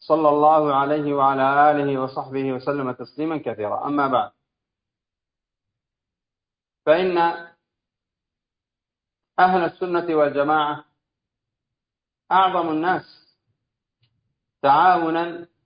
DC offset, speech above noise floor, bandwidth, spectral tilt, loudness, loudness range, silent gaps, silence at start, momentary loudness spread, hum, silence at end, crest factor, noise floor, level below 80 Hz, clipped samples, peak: under 0.1%; 69 dB; 5.2 kHz; -10.5 dB/octave; -20 LUFS; 6 LU; none; 0.1 s; 11 LU; none; 0.2 s; 18 dB; -88 dBFS; -68 dBFS; under 0.1%; -4 dBFS